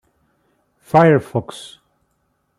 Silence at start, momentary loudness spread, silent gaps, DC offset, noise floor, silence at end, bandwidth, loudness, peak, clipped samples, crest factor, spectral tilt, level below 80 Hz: 0.95 s; 23 LU; none; under 0.1%; -67 dBFS; 1 s; 13 kHz; -16 LUFS; -2 dBFS; under 0.1%; 18 dB; -7.5 dB/octave; -58 dBFS